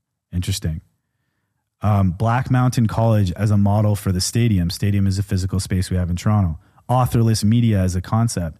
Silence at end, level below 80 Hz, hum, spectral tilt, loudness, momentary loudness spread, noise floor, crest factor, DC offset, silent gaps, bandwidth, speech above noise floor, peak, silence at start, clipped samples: 0.05 s; -38 dBFS; none; -6.5 dB/octave; -19 LUFS; 8 LU; -72 dBFS; 12 dB; under 0.1%; none; 14.5 kHz; 55 dB; -6 dBFS; 0.3 s; under 0.1%